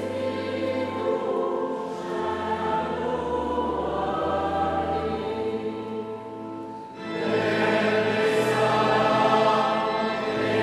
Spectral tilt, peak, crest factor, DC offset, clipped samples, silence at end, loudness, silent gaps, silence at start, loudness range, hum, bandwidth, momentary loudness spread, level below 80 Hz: -5.5 dB/octave; -8 dBFS; 18 dB; under 0.1%; under 0.1%; 0 s; -25 LUFS; none; 0 s; 6 LU; none; 13.5 kHz; 12 LU; -52 dBFS